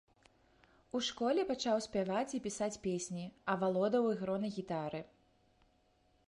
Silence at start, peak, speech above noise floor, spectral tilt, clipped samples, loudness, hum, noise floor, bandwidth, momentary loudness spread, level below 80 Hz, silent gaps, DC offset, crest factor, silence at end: 0.95 s; -20 dBFS; 37 dB; -5 dB/octave; under 0.1%; -36 LUFS; none; -73 dBFS; 11.5 kHz; 9 LU; -70 dBFS; none; under 0.1%; 18 dB; 1.2 s